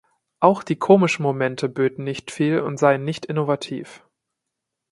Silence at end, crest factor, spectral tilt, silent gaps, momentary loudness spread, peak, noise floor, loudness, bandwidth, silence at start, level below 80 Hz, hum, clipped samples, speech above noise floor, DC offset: 0.95 s; 22 dB; -6.5 dB/octave; none; 13 LU; 0 dBFS; -82 dBFS; -21 LUFS; 11.5 kHz; 0.4 s; -66 dBFS; none; under 0.1%; 62 dB; under 0.1%